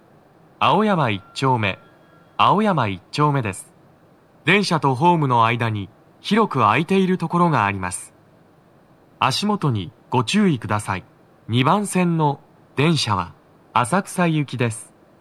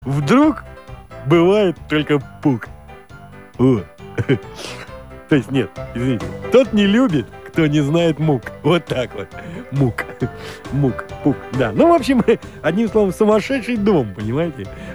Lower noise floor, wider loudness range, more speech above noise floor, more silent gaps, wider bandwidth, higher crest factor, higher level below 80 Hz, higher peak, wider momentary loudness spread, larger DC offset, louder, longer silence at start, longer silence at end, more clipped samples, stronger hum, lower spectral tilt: first, -53 dBFS vs -39 dBFS; about the same, 4 LU vs 5 LU; first, 34 dB vs 22 dB; neither; second, 13.5 kHz vs over 20 kHz; about the same, 20 dB vs 16 dB; second, -62 dBFS vs -42 dBFS; about the same, 0 dBFS vs -2 dBFS; second, 12 LU vs 17 LU; second, under 0.1% vs 0.3%; about the same, -20 LUFS vs -18 LUFS; first, 0.6 s vs 0 s; first, 0.35 s vs 0 s; neither; neither; second, -5.5 dB/octave vs -7 dB/octave